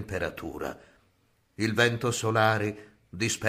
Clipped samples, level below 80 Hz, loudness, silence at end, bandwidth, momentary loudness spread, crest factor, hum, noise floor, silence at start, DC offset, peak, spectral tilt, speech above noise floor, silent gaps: under 0.1%; -56 dBFS; -28 LUFS; 0 s; 15.5 kHz; 18 LU; 20 dB; none; -68 dBFS; 0 s; under 0.1%; -8 dBFS; -4.5 dB/octave; 40 dB; none